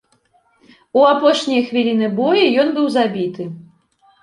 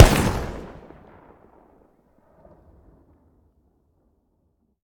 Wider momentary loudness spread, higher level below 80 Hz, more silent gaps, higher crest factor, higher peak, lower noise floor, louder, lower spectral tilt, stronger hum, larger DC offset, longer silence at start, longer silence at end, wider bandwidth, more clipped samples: second, 11 LU vs 29 LU; second, -66 dBFS vs -30 dBFS; neither; second, 16 dB vs 24 dB; about the same, 0 dBFS vs 0 dBFS; second, -59 dBFS vs -68 dBFS; first, -16 LUFS vs -22 LUFS; about the same, -5.5 dB/octave vs -5.5 dB/octave; neither; neither; first, 0.95 s vs 0 s; second, 0.6 s vs 4.2 s; second, 11 kHz vs 19.5 kHz; neither